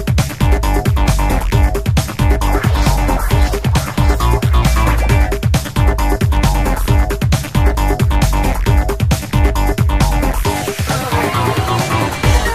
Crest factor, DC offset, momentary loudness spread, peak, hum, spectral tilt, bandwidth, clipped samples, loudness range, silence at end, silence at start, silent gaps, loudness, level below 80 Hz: 12 dB; 1%; 3 LU; 0 dBFS; none; -5.5 dB/octave; 16 kHz; under 0.1%; 1 LU; 0 s; 0 s; none; -15 LUFS; -16 dBFS